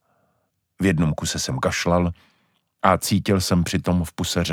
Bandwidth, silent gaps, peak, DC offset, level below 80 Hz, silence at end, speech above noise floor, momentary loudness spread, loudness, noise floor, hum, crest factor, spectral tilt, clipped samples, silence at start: 17.5 kHz; none; 0 dBFS; under 0.1%; -42 dBFS; 0 s; 50 dB; 4 LU; -22 LUFS; -71 dBFS; none; 22 dB; -5 dB/octave; under 0.1%; 0.8 s